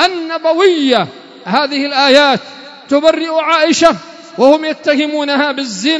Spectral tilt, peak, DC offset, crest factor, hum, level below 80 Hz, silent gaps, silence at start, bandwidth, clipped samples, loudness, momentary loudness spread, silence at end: -3 dB/octave; 0 dBFS; under 0.1%; 12 dB; none; -54 dBFS; none; 0 s; 11 kHz; 0.4%; -12 LUFS; 12 LU; 0 s